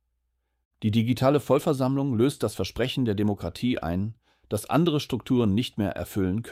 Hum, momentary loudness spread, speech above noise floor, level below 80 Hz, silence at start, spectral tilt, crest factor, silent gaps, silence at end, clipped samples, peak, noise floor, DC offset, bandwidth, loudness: none; 7 LU; 51 dB; -52 dBFS; 0.8 s; -6.5 dB/octave; 16 dB; none; 0 s; under 0.1%; -8 dBFS; -76 dBFS; under 0.1%; 16 kHz; -26 LUFS